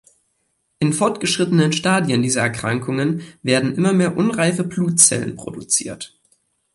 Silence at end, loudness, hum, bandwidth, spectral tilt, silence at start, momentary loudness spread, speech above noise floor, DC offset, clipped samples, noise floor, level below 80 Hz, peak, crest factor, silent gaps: 0.7 s; -18 LUFS; none; 11.5 kHz; -4 dB/octave; 0.8 s; 12 LU; 50 dB; under 0.1%; under 0.1%; -69 dBFS; -56 dBFS; 0 dBFS; 20 dB; none